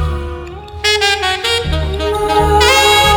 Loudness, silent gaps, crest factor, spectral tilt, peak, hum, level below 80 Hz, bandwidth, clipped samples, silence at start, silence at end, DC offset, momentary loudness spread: -12 LUFS; none; 14 dB; -3 dB/octave; 0 dBFS; none; -24 dBFS; over 20 kHz; under 0.1%; 0 s; 0 s; under 0.1%; 16 LU